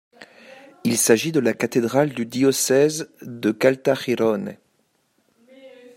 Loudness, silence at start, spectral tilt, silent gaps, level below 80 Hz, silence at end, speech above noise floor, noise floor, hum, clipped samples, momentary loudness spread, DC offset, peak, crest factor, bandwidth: -20 LUFS; 0.85 s; -4 dB/octave; none; -68 dBFS; 0.3 s; 47 dB; -67 dBFS; none; under 0.1%; 10 LU; under 0.1%; -2 dBFS; 20 dB; 16 kHz